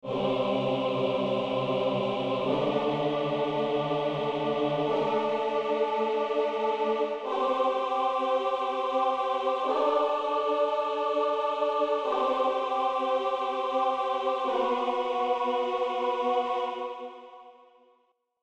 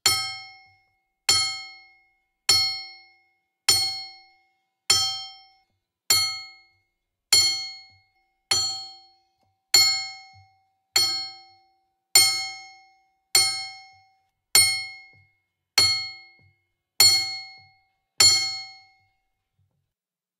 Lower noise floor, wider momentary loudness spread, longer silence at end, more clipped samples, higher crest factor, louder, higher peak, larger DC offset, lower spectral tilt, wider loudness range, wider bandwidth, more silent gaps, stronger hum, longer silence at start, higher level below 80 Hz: second, -70 dBFS vs -89 dBFS; second, 2 LU vs 20 LU; second, 0.9 s vs 1.7 s; neither; second, 14 dB vs 26 dB; second, -28 LUFS vs -20 LUFS; second, -14 dBFS vs 0 dBFS; neither; first, -6 dB/octave vs 1.5 dB/octave; second, 1 LU vs 4 LU; second, 9 kHz vs 15.5 kHz; neither; neither; about the same, 0.05 s vs 0.05 s; about the same, -68 dBFS vs -70 dBFS